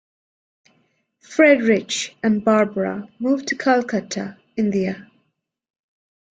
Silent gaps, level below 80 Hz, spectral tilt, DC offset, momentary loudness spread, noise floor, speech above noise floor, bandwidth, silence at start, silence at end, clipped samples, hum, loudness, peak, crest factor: none; -64 dBFS; -5 dB/octave; under 0.1%; 13 LU; -73 dBFS; 54 dB; 9.4 kHz; 1.3 s; 1.3 s; under 0.1%; none; -20 LUFS; -2 dBFS; 20 dB